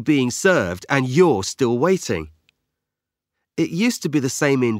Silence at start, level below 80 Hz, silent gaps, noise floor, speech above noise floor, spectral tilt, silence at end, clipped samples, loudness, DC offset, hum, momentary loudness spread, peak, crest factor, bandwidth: 0 s; -54 dBFS; none; -85 dBFS; 66 dB; -5 dB/octave; 0 s; under 0.1%; -19 LUFS; under 0.1%; none; 9 LU; 0 dBFS; 20 dB; 16 kHz